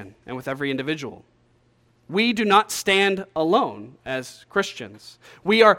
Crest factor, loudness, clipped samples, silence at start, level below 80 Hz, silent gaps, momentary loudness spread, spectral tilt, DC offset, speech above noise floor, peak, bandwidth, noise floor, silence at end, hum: 22 dB; -22 LUFS; under 0.1%; 0 s; -60 dBFS; none; 17 LU; -4 dB/octave; under 0.1%; 39 dB; 0 dBFS; 17 kHz; -61 dBFS; 0 s; none